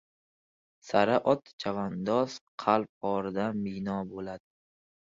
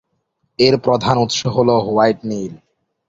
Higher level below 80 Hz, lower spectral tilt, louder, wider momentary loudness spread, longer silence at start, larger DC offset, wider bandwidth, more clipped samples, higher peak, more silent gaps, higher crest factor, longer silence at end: second, -66 dBFS vs -50 dBFS; about the same, -6.5 dB/octave vs -5.5 dB/octave; second, -30 LUFS vs -16 LUFS; about the same, 11 LU vs 12 LU; first, 0.85 s vs 0.6 s; neither; about the same, 7.8 kHz vs 8 kHz; neither; second, -8 dBFS vs 0 dBFS; first, 1.53-1.59 s, 2.41-2.58 s, 2.89-3.01 s vs none; first, 22 dB vs 16 dB; first, 0.75 s vs 0.55 s